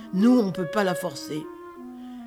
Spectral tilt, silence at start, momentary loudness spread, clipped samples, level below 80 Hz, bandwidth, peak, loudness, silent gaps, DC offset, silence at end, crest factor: -6 dB/octave; 0 s; 21 LU; under 0.1%; -66 dBFS; 15.5 kHz; -8 dBFS; -24 LUFS; none; under 0.1%; 0 s; 16 dB